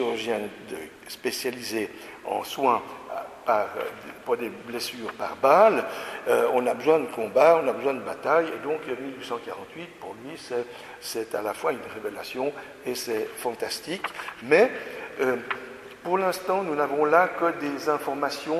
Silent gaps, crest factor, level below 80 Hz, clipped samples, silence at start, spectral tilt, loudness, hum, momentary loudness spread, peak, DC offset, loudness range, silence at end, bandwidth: none; 22 dB; -68 dBFS; under 0.1%; 0 s; -4 dB/octave; -26 LUFS; none; 16 LU; -4 dBFS; under 0.1%; 10 LU; 0 s; 14 kHz